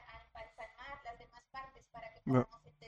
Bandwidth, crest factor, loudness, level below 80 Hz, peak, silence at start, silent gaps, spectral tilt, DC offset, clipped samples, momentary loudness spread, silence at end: 7.4 kHz; 24 dB; -40 LUFS; -64 dBFS; -18 dBFS; 0 s; none; -8.5 dB/octave; under 0.1%; under 0.1%; 20 LU; 0 s